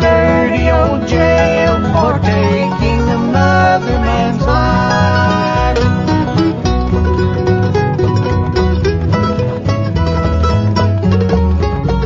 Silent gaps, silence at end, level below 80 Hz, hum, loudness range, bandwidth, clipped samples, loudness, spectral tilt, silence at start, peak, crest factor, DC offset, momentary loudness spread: none; 0 s; -22 dBFS; none; 2 LU; 7.6 kHz; under 0.1%; -13 LUFS; -7.5 dB/octave; 0 s; 0 dBFS; 12 dB; under 0.1%; 4 LU